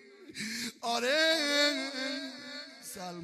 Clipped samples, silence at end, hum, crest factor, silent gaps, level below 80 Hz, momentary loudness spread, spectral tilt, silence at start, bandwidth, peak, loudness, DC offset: under 0.1%; 0 s; none; 18 dB; none; -80 dBFS; 17 LU; -1.5 dB/octave; 0 s; 14.5 kHz; -14 dBFS; -30 LUFS; under 0.1%